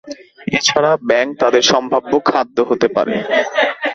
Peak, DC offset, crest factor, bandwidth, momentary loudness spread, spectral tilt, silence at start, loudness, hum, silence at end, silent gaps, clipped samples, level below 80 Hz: 0 dBFS; under 0.1%; 16 dB; 8.2 kHz; 5 LU; -3 dB/octave; 0.05 s; -15 LUFS; none; 0 s; none; under 0.1%; -56 dBFS